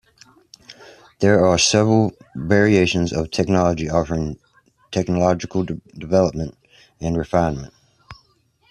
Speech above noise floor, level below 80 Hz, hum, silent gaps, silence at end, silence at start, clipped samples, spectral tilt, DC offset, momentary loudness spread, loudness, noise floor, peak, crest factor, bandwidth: 42 dB; -44 dBFS; none; none; 0.6 s; 0.7 s; under 0.1%; -5 dB/octave; under 0.1%; 15 LU; -19 LUFS; -60 dBFS; -2 dBFS; 18 dB; 11 kHz